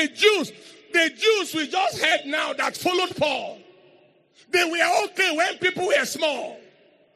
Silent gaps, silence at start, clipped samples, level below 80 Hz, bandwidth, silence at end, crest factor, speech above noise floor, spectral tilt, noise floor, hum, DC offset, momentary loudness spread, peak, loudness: none; 0 s; under 0.1%; -72 dBFS; 14 kHz; 0.55 s; 20 dB; 34 dB; -2 dB/octave; -57 dBFS; none; under 0.1%; 6 LU; -4 dBFS; -22 LUFS